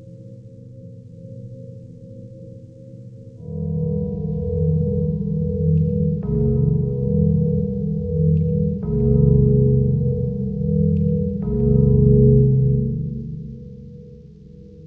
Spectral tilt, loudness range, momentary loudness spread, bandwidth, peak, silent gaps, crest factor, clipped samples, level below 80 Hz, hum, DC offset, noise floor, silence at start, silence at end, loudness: -14.5 dB/octave; 13 LU; 25 LU; 1.3 kHz; -2 dBFS; none; 16 dB; under 0.1%; -32 dBFS; none; under 0.1%; -42 dBFS; 0 s; 0 s; -19 LUFS